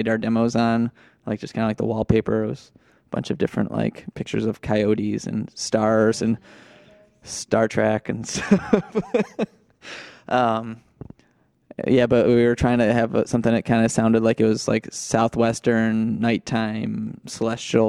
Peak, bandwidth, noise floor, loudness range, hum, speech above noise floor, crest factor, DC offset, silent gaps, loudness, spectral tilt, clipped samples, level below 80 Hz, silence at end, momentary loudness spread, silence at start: -2 dBFS; 11.5 kHz; -62 dBFS; 5 LU; none; 41 dB; 20 dB; under 0.1%; none; -22 LUFS; -6 dB/octave; under 0.1%; -48 dBFS; 0 s; 12 LU; 0 s